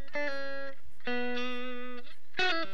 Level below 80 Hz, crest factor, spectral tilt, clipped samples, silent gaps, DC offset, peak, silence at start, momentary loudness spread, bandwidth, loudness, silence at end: -72 dBFS; 20 dB; -4 dB/octave; under 0.1%; none; 4%; -14 dBFS; 0 s; 14 LU; 19 kHz; -35 LUFS; 0 s